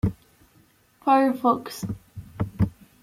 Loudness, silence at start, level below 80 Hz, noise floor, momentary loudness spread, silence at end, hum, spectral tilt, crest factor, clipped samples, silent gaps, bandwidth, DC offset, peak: -25 LUFS; 0.05 s; -46 dBFS; -59 dBFS; 15 LU; 0.35 s; none; -7.5 dB/octave; 18 dB; under 0.1%; none; 16 kHz; under 0.1%; -8 dBFS